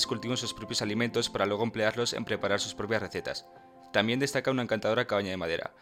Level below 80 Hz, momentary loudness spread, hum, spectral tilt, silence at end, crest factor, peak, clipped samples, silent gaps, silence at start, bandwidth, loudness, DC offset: -64 dBFS; 5 LU; none; -4 dB/octave; 0.1 s; 24 dB; -6 dBFS; under 0.1%; none; 0 s; 16.5 kHz; -30 LUFS; under 0.1%